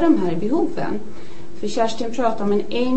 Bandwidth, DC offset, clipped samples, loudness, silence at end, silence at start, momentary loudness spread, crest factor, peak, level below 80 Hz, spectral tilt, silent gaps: 8.6 kHz; 9%; under 0.1%; -22 LUFS; 0 s; 0 s; 15 LU; 16 dB; -4 dBFS; -50 dBFS; -6 dB/octave; none